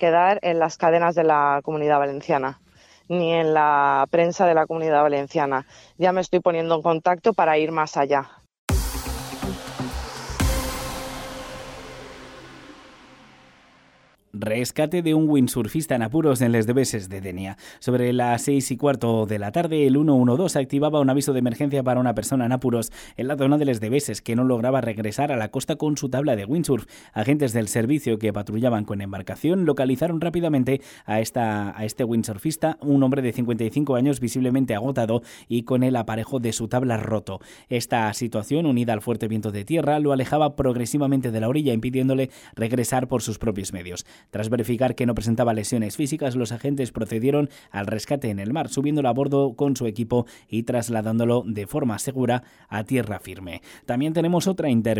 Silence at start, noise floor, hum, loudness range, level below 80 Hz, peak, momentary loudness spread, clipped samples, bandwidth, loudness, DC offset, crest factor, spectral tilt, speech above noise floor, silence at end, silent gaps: 0 s; -57 dBFS; none; 5 LU; -44 dBFS; -6 dBFS; 12 LU; under 0.1%; 18 kHz; -23 LUFS; under 0.1%; 16 dB; -6 dB/octave; 35 dB; 0 s; 8.58-8.68 s